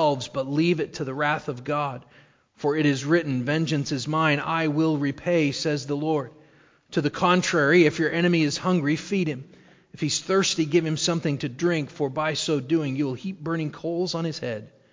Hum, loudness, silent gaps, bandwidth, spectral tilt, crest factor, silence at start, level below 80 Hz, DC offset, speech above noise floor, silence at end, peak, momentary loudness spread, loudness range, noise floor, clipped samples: none; -24 LUFS; none; 7.6 kHz; -5 dB/octave; 18 dB; 0 s; -64 dBFS; under 0.1%; 33 dB; 0.25 s; -6 dBFS; 8 LU; 4 LU; -57 dBFS; under 0.1%